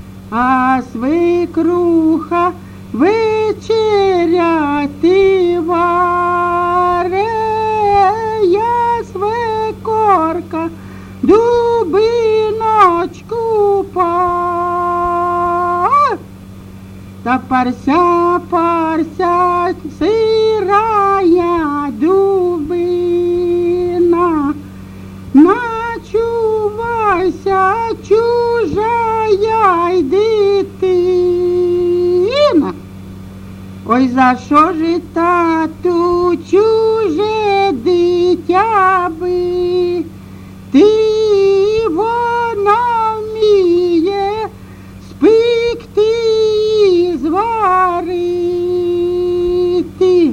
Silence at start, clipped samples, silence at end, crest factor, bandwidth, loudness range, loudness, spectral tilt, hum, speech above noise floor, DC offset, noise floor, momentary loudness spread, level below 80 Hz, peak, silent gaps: 0 s; under 0.1%; 0 s; 12 dB; 10 kHz; 2 LU; -13 LUFS; -6.5 dB/octave; none; 21 dB; under 0.1%; -33 dBFS; 7 LU; -42 dBFS; 0 dBFS; none